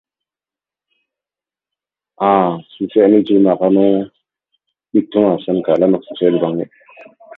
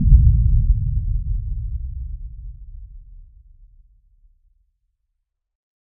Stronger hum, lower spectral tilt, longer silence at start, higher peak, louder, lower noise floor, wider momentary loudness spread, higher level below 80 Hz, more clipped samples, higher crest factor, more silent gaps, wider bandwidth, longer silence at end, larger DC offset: neither; second, -10.5 dB/octave vs -27.5 dB/octave; first, 2.2 s vs 0 s; about the same, 0 dBFS vs 0 dBFS; first, -15 LUFS vs -21 LUFS; first, -90 dBFS vs -76 dBFS; second, 9 LU vs 26 LU; second, -60 dBFS vs -22 dBFS; neither; about the same, 16 dB vs 20 dB; neither; first, 4 kHz vs 0.3 kHz; second, 0.35 s vs 2.75 s; neither